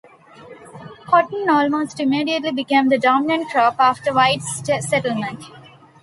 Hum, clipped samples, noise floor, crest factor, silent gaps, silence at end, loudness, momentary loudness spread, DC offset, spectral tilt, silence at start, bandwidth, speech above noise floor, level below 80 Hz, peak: none; under 0.1%; -43 dBFS; 18 dB; none; 0.4 s; -18 LUFS; 11 LU; under 0.1%; -4 dB/octave; 0.4 s; 11.5 kHz; 25 dB; -62 dBFS; -2 dBFS